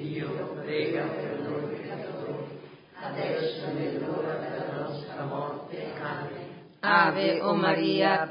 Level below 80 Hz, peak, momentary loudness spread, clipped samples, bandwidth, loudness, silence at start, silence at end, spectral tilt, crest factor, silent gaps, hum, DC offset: -72 dBFS; -6 dBFS; 14 LU; under 0.1%; 5.4 kHz; -29 LUFS; 0 s; 0 s; -10 dB/octave; 22 dB; none; none; under 0.1%